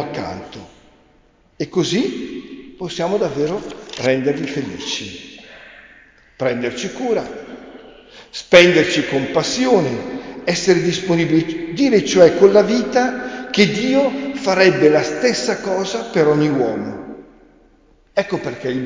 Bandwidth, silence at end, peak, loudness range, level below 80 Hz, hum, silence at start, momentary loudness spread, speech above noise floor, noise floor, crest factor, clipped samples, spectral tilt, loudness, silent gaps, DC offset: 7.6 kHz; 0 s; 0 dBFS; 9 LU; -52 dBFS; none; 0 s; 19 LU; 38 dB; -54 dBFS; 18 dB; under 0.1%; -4.5 dB/octave; -17 LUFS; none; under 0.1%